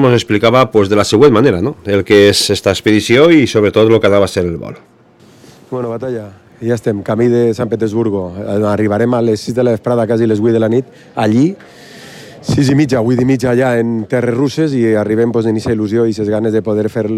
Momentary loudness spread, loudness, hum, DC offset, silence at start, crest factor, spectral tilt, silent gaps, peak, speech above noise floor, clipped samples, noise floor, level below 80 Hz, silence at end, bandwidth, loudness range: 11 LU; -12 LUFS; none; under 0.1%; 0 s; 12 dB; -6 dB/octave; none; 0 dBFS; 32 dB; 0.4%; -44 dBFS; -46 dBFS; 0 s; 15 kHz; 7 LU